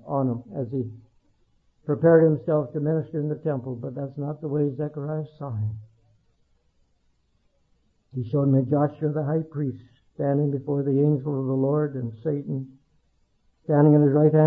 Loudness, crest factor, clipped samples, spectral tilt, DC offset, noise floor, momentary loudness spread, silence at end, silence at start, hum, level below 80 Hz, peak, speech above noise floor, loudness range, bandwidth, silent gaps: -24 LUFS; 18 dB; under 0.1%; -13 dB/octave; under 0.1%; -67 dBFS; 15 LU; 0 s; 0.05 s; none; -66 dBFS; -6 dBFS; 45 dB; 8 LU; 2.1 kHz; none